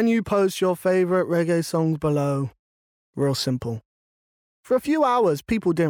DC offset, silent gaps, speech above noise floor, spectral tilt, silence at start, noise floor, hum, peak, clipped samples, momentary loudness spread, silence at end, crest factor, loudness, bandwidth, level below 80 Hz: under 0.1%; 2.59-3.13 s, 3.85-4.63 s; over 69 dB; -6.5 dB/octave; 0 s; under -90 dBFS; none; -10 dBFS; under 0.1%; 8 LU; 0 s; 12 dB; -22 LUFS; 19.5 kHz; -54 dBFS